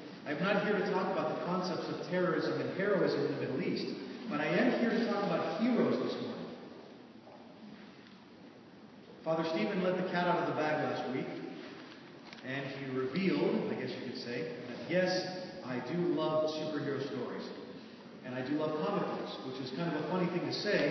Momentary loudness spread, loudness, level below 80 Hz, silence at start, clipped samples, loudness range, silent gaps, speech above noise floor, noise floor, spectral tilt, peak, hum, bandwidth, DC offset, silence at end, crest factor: 20 LU; -34 LUFS; -82 dBFS; 0 s; under 0.1%; 5 LU; none; 21 dB; -55 dBFS; -4.5 dB/octave; -18 dBFS; none; 6.2 kHz; under 0.1%; 0 s; 18 dB